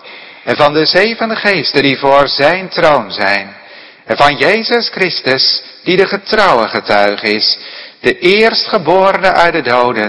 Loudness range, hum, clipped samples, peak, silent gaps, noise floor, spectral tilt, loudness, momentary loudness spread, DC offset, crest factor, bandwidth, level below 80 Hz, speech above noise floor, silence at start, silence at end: 1 LU; none; 1%; 0 dBFS; none; -36 dBFS; -5 dB/octave; -11 LUFS; 7 LU; under 0.1%; 12 dB; 11 kHz; -44 dBFS; 25 dB; 0.05 s; 0 s